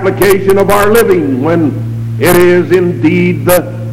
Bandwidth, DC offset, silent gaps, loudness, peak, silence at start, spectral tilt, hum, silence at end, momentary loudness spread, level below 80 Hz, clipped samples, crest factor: 17 kHz; under 0.1%; none; -9 LUFS; 0 dBFS; 0 s; -6 dB/octave; none; 0 s; 5 LU; -34 dBFS; 0.5%; 8 dB